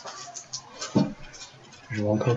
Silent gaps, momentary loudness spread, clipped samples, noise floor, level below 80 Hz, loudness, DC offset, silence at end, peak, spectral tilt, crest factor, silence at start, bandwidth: none; 17 LU; under 0.1%; -47 dBFS; -56 dBFS; -30 LUFS; under 0.1%; 0 s; -10 dBFS; -5.5 dB/octave; 20 dB; 0 s; 8.2 kHz